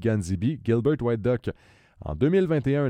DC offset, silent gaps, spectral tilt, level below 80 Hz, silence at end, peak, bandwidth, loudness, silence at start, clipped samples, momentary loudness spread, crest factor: under 0.1%; none; -8 dB/octave; -46 dBFS; 0 s; -10 dBFS; 11 kHz; -25 LUFS; 0 s; under 0.1%; 12 LU; 16 dB